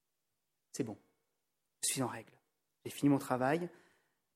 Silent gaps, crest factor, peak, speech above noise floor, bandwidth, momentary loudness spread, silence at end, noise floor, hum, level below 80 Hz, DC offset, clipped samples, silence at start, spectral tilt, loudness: none; 22 dB; -18 dBFS; 52 dB; 16 kHz; 17 LU; 0.65 s; -88 dBFS; none; -78 dBFS; under 0.1%; under 0.1%; 0.75 s; -4.5 dB/octave; -36 LUFS